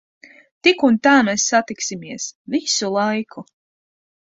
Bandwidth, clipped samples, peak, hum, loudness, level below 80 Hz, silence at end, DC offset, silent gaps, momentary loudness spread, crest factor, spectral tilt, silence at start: 8 kHz; under 0.1%; -2 dBFS; none; -18 LUFS; -64 dBFS; 0.8 s; under 0.1%; 2.35-2.45 s; 14 LU; 18 dB; -2.5 dB/octave; 0.65 s